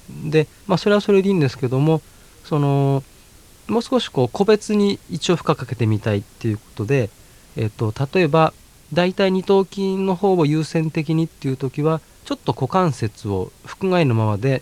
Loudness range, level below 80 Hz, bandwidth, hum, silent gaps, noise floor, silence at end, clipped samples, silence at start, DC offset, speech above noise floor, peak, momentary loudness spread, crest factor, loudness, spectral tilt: 3 LU; -50 dBFS; 14.5 kHz; none; none; -47 dBFS; 0 s; under 0.1%; 0.1 s; under 0.1%; 28 dB; 0 dBFS; 9 LU; 18 dB; -20 LUFS; -7 dB/octave